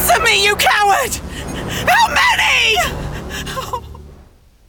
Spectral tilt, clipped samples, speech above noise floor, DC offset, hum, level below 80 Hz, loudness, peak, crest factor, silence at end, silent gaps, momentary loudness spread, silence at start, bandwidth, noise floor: -2 dB/octave; under 0.1%; 31 dB; under 0.1%; none; -34 dBFS; -13 LUFS; -2 dBFS; 14 dB; 0.55 s; none; 15 LU; 0 s; 19.5 kHz; -45 dBFS